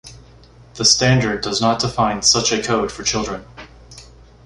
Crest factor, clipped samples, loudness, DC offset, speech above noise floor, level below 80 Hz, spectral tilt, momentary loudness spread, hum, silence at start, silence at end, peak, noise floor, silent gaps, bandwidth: 18 dB; under 0.1%; -16 LUFS; under 0.1%; 27 dB; -42 dBFS; -3 dB/octave; 8 LU; none; 0.05 s; 0.4 s; -2 dBFS; -45 dBFS; none; 11.5 kHz